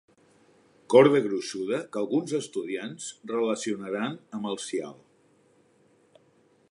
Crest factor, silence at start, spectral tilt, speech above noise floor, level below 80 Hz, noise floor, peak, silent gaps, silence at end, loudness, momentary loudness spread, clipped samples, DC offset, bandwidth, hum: 24 dB; 0.9 s; -5 dB/octave; 37 dB; -80 dBFS; -63 dBFS; -4 dBFS; none; 1.8 s; -27 LUFS; 15 LU; under 0.1%; under 0.1%; 11.5 kHz; none